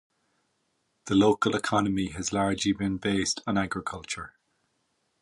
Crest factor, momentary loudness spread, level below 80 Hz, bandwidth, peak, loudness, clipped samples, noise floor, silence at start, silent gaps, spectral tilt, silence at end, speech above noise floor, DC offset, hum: 18 dB; 13 LU; -54 dBFS; 11.5 kHz; -10 dBFS; -27 LUFS; under 0.1%; -75 dBFS; 1.05 s; none; -4.5 dB/octave; 0.95 s; 48 dB; under 0.1%; none